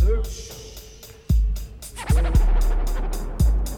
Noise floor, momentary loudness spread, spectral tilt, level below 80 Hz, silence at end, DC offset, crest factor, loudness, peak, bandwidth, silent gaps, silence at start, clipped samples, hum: -43 dBFS; 18 LU; -6 dB/octave; -22 dBFS; 0 s; under 0.1%; 14 dB; -24 LUFS; -8 dBFS; 16.5 kHz; none; 0 s; under 0.1%; none